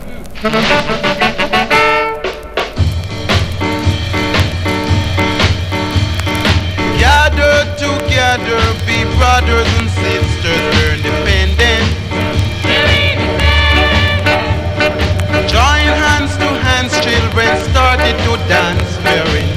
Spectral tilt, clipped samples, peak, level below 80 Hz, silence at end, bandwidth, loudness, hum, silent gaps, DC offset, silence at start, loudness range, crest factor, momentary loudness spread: -5 dB/octave; under 0.1%; 0 dBFS; -20 dBFS; 0 s; 14.5 kHz; -12 LUFS; none; none; under 0.1%; 0 s; 3 LU; 12 dB; 6 LU